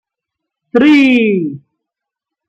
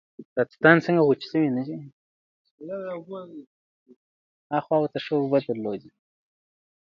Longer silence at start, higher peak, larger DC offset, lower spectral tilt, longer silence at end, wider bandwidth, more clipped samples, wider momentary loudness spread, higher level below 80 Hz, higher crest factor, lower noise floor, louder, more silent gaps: first, 0.75 s vs 0.2 s; about the same, -2 dBFS vs -2 dBFS; neither; second, -6.5 dB/octave vs -8 dB/octave; second, 0.9 s vs 1.15 s; first, 8 kHz vs 7 kHz; neither; second, 10 LU vs 20 LU; first, -56 dBFS vs -72 dBFS; second, 12 dB vs 24 dB; second, -82 dBFS vs under -90 dBFS; first, -10 LUFS vs -24 LUFS; second, none vs 0.25-0.36 s, 1.93-2.45 s, 2.51-2.58 s, 3.47-3.86 s, 3.96-4.50 s